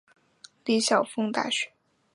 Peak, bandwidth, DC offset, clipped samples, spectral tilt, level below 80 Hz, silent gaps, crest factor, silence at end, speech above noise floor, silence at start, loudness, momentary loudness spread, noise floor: -8 dBFS; 11.5 kHz; under 0.1%; under 0.1%; -3 dB/octave; -80 dBFS; none; 20 dB; 0.5 s; 30 dB; 0.65 s; -26 LUFS; 11 LU; -56 dBFS